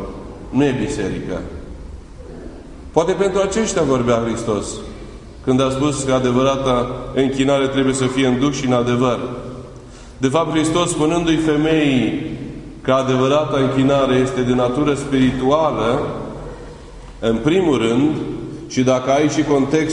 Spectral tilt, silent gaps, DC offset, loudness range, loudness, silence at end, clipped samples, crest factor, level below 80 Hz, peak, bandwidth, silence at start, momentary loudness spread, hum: -5.5 dB/octave; none; under 0.1%; 3 LU; -18 LUFS; 0 s; under 0.1%; 18 dB; -38 dBFS; 0 dBFS; 11 kHz; 0 s; 18 LU; none